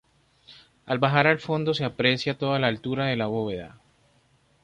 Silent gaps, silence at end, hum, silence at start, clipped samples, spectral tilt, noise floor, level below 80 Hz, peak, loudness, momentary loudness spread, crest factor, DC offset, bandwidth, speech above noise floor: none; 0.95 s; none; 0.5 s; under 0.1%; -6.5 dB/octave; -63 dBFS; -60 dBFS; -4 dBFS; -24 LUFS; 10 LU; 22 dB; under 0.1%; 9.6 kHz; 39 dB